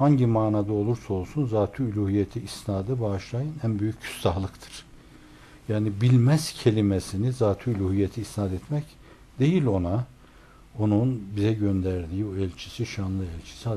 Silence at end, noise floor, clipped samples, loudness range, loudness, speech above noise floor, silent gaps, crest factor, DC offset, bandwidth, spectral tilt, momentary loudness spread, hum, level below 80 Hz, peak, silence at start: 0 s; -51 dBFS; under 0.1%; 5 LU; -26 LUFS; 26 dB; none; 18 dB; under 0.1%; 13 kHz; -7.5 dB/octave; 10 LU; none; -50 dBFS; -8 dBFS; 0 s